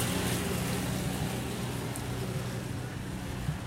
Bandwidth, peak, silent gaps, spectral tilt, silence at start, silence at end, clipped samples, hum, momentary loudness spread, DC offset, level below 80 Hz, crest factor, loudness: 16 kHz; -16 dBFS; none; -5 dB/octave; 0 s; 0 s; under 0.1%; none; 7 LU; under 0.1%; -46 dBFS; 16 dB; -34 LUFS